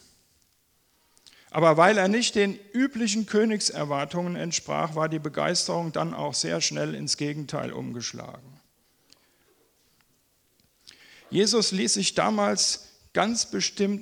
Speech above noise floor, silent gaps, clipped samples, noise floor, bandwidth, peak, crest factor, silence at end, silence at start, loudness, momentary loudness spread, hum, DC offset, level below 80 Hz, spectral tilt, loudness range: 42 dB; none; under 0.1%; -67 dBFS; 17.5 kHz; -4 dBFS; 24 dB; 0 s; 1.55 s; -25 LUFS; 11 LU; none; under 0.1%; -66 dBFS; -3.5 dB/octave; 11 LU